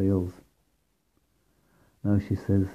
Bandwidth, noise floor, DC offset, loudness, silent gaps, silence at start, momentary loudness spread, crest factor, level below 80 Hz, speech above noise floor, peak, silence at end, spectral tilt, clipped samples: 7.2 kHz; -72 dBFS; under 0.1%; -28 LUFS; none; 0 s; 8 LU; 18 dB; -58 dBFS; 47 dB; -12 dBFS; 0 s; -10 dB/octave; under 0.1%